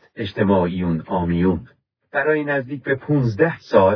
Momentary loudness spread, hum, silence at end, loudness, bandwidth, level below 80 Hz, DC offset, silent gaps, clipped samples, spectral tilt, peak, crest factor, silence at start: 7 LU; none; 0 s; -20 LUFS; 5.4 kHz; -46 dBFS; under 0.1%; none; under 0.1%; -9 dB/octave; -2 dBFS; 18 dB; 0.15 s